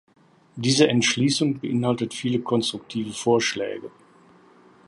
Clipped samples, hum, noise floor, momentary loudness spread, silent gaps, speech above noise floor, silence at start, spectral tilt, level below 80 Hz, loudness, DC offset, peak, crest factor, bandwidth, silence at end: under 0.1%; none; -53 dBFS; 12 LU; none; 31 dB; 0.55 s; -4.5 dB/octave; -64 dBFS; -23 LUFS; under 0.1%; -2 dBFS; 22 dB; 11.5 kHz; 1 s